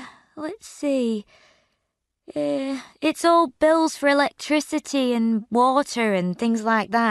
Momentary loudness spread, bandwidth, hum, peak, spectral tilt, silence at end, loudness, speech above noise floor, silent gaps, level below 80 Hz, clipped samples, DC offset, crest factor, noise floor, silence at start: 13 LU; 12 kHz; none; -6 dBFS; -4.5 dB/octave; 0 s; -22 LUFS; 56 dB; none; -64 dBFS; under 0.1%; under 0.1%; 18 dB; -78 dBFS; 0 s